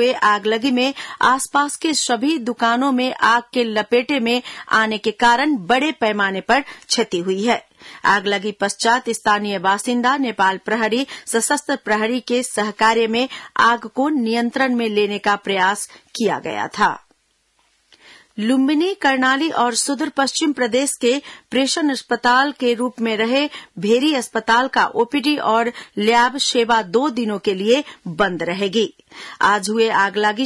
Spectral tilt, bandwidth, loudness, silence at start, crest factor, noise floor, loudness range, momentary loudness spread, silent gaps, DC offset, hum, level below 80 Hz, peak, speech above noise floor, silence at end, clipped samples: -3 dB/octave; 12 kHz; -18 LUFS; 0 s; 16 dB; -63 dBFS; 2 LU; 6 LU; none; under 0.1%; none; -60 dBFS; -4 dBFS; 45 dB; 0 s; under 0.1%